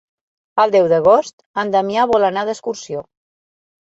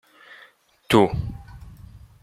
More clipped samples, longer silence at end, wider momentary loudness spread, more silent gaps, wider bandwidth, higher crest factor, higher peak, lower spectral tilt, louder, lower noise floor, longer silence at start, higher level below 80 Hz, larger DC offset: neither; first, 0.85 s vs 0.25 s; second, 14 LU vs 26 LU; first, 1.33-1.38 s, 1.46-1.54 s vs none; second, 8 kHz vs 15.5 kHz; second, 16 dB vs 22 dB; about the same, -2 dBFS vs -2 dBFS; about the same, -5 dB/octave vs -6 dB/octave; first, -16 LUFS vs -21 LUFS; first, under -90 dBFS vs -54 dBFS; second, 0.55 s vs 0.9 s; second, -58 dBFS vs -44 dBFS; neither